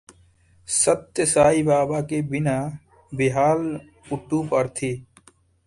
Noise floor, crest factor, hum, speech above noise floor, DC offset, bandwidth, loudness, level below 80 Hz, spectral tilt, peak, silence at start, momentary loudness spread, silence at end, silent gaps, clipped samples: -57 dBFS; 18 dB; none; 35 dB; under 0.1%; 11.5 kHz; -22 LUFS; -52 dBFS; -5 dB/octave; -4 dBFS; 0.7 s; 16 LU; 0.65 s; none; under 0.1%